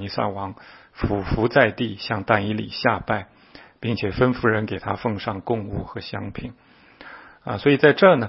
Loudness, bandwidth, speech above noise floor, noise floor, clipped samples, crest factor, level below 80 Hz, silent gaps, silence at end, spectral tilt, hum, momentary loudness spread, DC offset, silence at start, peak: -22 LUFS; 5.8 kHz; 23 dB; -45 dBFS; under 0.1%; 22 dB; -44 dBFS; none; 0 s; -10.5 dB/octave; none; 18 LU; under 0.1%; 0 s; 0 dBFS